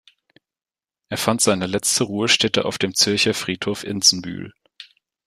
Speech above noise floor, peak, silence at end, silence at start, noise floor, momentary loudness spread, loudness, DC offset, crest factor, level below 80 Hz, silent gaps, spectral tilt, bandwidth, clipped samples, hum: over 70 dB; -2 dBFS; 0.45 s; 1.1 s; under -90 dBFS; 13 LU; -18 LUFS; under 0.1%; 20 dB; -58 dBFS; none; -2.5 dB/octave; 15.5 kHz; under 0.1%; none